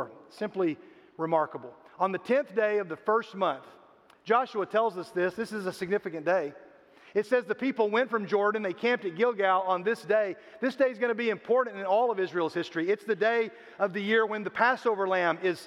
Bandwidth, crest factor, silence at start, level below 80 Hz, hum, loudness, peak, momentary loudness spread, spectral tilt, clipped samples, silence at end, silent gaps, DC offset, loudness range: 12.5 kHz; 20 dB; 0 s; -80 dBFS; none; -28 LUFS; -8 dBFS; 8 LU; -5.5 dB/octave; under 0.1%; 0 s; none; under 0.1%; 3 LU